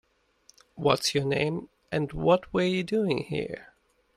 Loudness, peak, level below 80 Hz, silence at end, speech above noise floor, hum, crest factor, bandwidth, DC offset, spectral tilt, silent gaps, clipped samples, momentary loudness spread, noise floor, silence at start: -27 LUFS; -6 dBFS; -54 dBFS; 0.55 s; 36 dB; none; 22 dB; 15.5 kHz; under 0.1%; -5 dB/octave; none; under 0.1%; 9 LU; -62 dBFS; 0.75 s